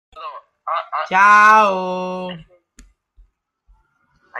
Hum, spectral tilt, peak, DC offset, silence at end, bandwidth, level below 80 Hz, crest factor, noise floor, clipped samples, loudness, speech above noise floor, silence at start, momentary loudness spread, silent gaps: none; -4 dB/octave; 0 dBFS; under 0.1%; 0 s; 12 kHz; -58 dBFS; 18 dB; -61 dBFS; under 0.1%; -14 LUFS; 47 dB; 0.15 s; 25 LU; none